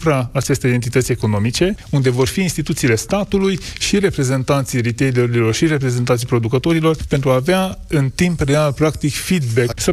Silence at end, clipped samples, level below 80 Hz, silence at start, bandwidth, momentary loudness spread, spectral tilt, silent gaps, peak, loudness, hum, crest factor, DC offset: 0 s; under 0.1%; -36 dBFS; 0 s; 15.5 kHz; 3 LU; -5.5 dB/octave; none; -4 dBFS; -17 LUFS; none; 12 dB; under 0.1%